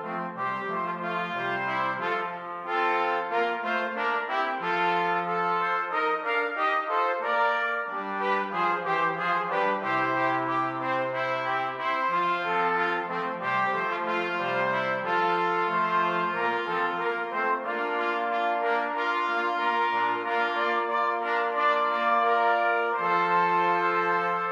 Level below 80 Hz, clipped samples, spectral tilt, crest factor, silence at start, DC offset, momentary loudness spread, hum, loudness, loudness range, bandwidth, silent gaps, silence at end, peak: -84 dBFS; under 0.1%; -5.5 dB/octave; 14 dB; 0 s; under 0.1%; 5 LU; none; -26 LUFS; 3 LU; 11.5 kHz; none; 0 s; -12 dBFS